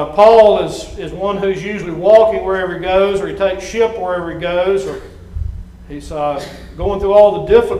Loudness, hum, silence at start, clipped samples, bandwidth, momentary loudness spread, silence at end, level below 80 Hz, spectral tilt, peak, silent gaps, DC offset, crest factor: -14 LUFS; none; 0 s; 0.2%; 11.5 kHz; 18 LU; 0 s; -34 dBFS; -5.5 dB/octave; 0 dBFS; none; under 0.1%; 14 dB